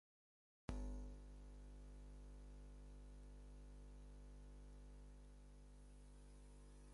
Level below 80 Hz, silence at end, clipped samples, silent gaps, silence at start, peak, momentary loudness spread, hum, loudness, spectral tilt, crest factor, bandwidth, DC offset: -58 dBFS; 0 s; under 0.1%; none; 0.7 s; -32 dBFS; 11 LU; 50 Hz at -60 dBFS; -60 LUFS; -6.5 dB/octave; 26 dB; 11.5 kHz; under 0.1%